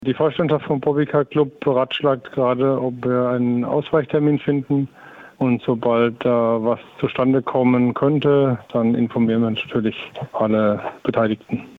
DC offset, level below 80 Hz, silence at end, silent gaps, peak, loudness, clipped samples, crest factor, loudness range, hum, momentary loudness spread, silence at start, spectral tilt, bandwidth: under 0.1%; -58 dBFS; 0.1 s; none; -6 dBFS; -20 LUFS; under 0.1%; 12 dB; 2 LU; none; 6 LU; 0 s; -9.5 dB/octave; 4.4 kHz